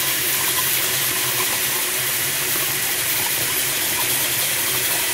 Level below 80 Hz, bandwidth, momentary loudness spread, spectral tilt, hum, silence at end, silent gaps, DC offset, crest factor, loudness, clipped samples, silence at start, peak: -56 dBFS; 16 kHz; 2 LU; 0 dB/octave; none; 0 s; none; under 0.1%; 14 dB; -18 LUFS; under 0.1%; 0 s; -8 dBFS